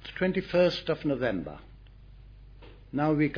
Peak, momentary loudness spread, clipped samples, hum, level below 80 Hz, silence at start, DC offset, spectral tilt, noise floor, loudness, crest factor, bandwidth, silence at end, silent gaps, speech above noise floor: -12 dBFS; 13 LU; under 0.1%; none; -52 dBFS; 0.05 s; under 0.1%; -7.5 dB/octave; -50 dBFS; -28 LUFS; 18 dB; 5.4 kHz; 0 s; none; 23 dB